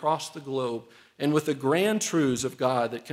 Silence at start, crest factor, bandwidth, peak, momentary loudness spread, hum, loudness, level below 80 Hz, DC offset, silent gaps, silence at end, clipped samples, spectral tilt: 0 s; 16 dB; 16 kHz; -10 dBFS; 8 LU; none; -27 LUFS; -66 dBFS; under 0.1%; none; 0 s; under 0.1%; -4.5 dB/octave